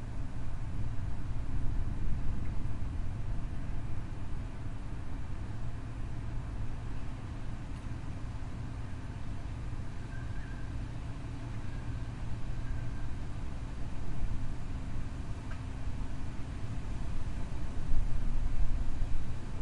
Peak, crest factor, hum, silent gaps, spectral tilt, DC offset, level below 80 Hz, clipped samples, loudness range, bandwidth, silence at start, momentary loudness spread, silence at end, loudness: -14 dBFS; 18 dB; none; none; -7 dB/octave; under 0.1%; -36 dBFS; under 0.1%; 3 LU; 7.6 kHz; 0 s; 4 LU; 0 s; -41 LUFS